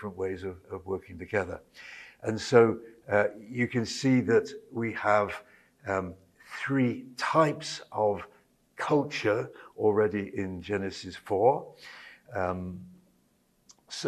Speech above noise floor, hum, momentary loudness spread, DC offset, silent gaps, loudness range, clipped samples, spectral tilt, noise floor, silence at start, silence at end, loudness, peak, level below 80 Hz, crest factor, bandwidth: 40 dB; none; 17 LU; under 0.1%; none; 3 LU; under 0.1%; -6 dB/octave; -69 dBFS; 0 s; 0 s; -29 LUFS; -6 dBFS; -64 dBFS; 24 dB; 13 kHz